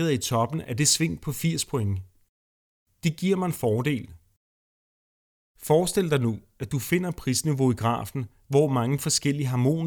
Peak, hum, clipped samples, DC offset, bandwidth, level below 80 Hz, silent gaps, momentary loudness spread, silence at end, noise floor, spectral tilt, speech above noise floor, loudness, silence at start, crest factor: -8 dBFS; none; under 0.1%; under 0.1%; over 20 kHz; -54 dBFS; 2.29-2.86 s, 4.37-5.55 s; 9 LU; 0 s; under -90 dBFS; -5 dB/octave; over 65 dB; -25 LUFS; 0 s; 18 dB